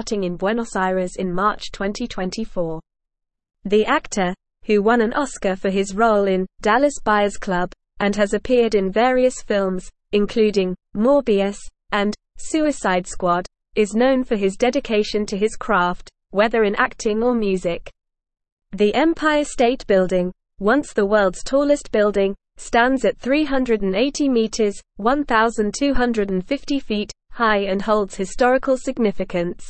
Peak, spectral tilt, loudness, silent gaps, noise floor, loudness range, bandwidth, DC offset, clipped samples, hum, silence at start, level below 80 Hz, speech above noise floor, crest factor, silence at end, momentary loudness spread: -2 dBFS; -5 dB/octave; -20 LUFS; 18.52-18.57 s; -80 dBFS; 2 LU; 8.8 kHz; 0.4%; under 0.1%; none; 0 s; -40 dBFS; 61 dB; 18 dB; 0 s; 8 LU